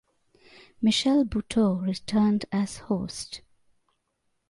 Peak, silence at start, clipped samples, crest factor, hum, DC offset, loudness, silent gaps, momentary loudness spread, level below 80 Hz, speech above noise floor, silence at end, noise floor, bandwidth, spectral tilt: -14 dBFS; 0.8 s; under 0.1%; 14 dB; none; under 0.1%; -26 LUFS; none; 12 LU; -54 dBFS; 50 dB; 1.1 s; -75 dBFS; 11.5 kHz; -5.5 dB/octave